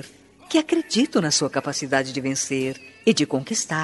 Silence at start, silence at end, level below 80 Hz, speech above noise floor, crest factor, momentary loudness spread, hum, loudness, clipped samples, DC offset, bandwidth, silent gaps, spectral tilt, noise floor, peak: 0 s; 0 s; -64 dBFS; 22 dB; 18 dB; 5 LU; none; -22 LUFS; under 0.1%; under 0.1%; 11.5 kHz; none; -3.5 dB/octave; -45 dBFS; -4 dBFS